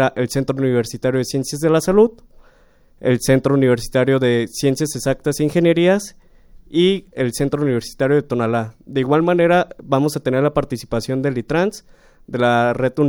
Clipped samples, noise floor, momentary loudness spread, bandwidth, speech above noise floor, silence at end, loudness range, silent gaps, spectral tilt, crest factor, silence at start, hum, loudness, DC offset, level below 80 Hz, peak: under 0.1%; -51 dBFS; 8 LU; 18.5 kHz; 34 dB; 0 s; 2 LU; none; -6 dB/octave; 16 dB; 0 s; none; -18 LUFS; under 0.1%; -44 dBFS; -2 dBFS